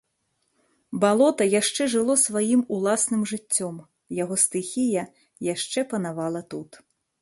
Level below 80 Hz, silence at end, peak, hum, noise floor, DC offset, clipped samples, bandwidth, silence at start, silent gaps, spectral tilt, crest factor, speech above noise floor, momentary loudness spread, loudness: -70 dBFS; 0.45 s; -6 dBFS; none; -74 dBFS; under 0.1%; under 0.1%; 12 kHz; 0.9 s; none; -3.5 dB/octave; 20 dB; 50 dB; 15 LU; -23 LUFS